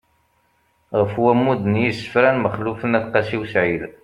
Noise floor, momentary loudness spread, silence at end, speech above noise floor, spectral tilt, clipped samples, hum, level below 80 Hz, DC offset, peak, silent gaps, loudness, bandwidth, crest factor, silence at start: -63 dBFS; 5 LU; 0.15 s; 44 dB; -7.5 dB/octave; under 0.1%; none; -54 dBFS; under 0.1%; -2 dBFS; none; -19 LUFS; 11 kHz; 18 dB; 0.9 s